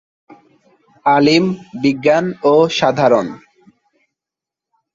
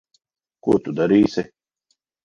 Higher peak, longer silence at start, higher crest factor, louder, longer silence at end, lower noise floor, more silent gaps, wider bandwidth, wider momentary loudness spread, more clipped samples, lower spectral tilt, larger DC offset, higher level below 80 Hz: first, 0 dBFS vs -4 dBFS; first, 1.05 s vs 0.65 s; about the same, 16 dB vs 18 dB; first, -14 LUFS vs -20 LUFS; first, 1.6 s vs 0.8 s; first, -86 dBFS vs -71 dBFS; neither; about the same, 7.6 kHz vs 7.2 kHz; second, 8 LU vs 12 LU; neither; second, -5.5 dB/octave vs -7.5 dB/octave; neither; about the same, -58 dBFS vs -56 dBFS